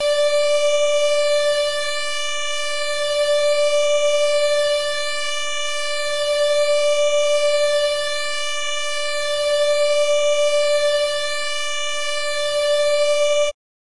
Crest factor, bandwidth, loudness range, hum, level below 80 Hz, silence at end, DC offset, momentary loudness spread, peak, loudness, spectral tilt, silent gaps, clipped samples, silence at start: 8 dB; 11.5 kHz; 0 LU; none; -56 dBFS; 0.45 s; under 0.1%; 5 LU; -10 dBFS; -19 LUFS; 1 dB/octave; none; under 0.1%; 0 s